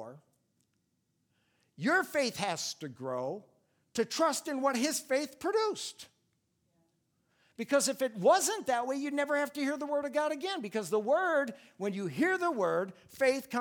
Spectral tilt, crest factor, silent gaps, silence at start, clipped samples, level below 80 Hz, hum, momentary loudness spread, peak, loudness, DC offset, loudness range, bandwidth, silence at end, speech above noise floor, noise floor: -3 dB/octave; 20 dB; none; 0 s; under 0.1%; -80 dBFS; none; 11 LU; -14 dBFS; -32 LUFS; under 0.1%; 4 LU; over 20 kHz; 0 s; 47 dB; -78 dBFS